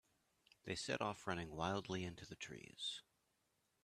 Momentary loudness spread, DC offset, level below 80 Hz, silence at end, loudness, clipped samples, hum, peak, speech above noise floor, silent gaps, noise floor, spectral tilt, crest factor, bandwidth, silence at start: 10 LU; under 0.1%; -72 dBFS; 0.8 s; -46 LUFS; under 0.1%; none; -26 dBFS; 38 dB; none; -84 dBFS; -4 dB/octave; 22 dB; 14 kHz; 0.65 s